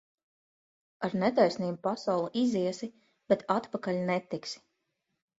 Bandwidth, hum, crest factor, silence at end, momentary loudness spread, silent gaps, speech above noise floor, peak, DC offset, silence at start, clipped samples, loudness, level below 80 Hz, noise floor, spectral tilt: 8 kHz; none; 20 dB; 0.8 s; 12 LU; none; 52 dB; -12 dBFS; under 0.1%; 1 s; under 0.1%; -30 LUFS; -74 dBFS; -81 dBFS; -6 dB/octave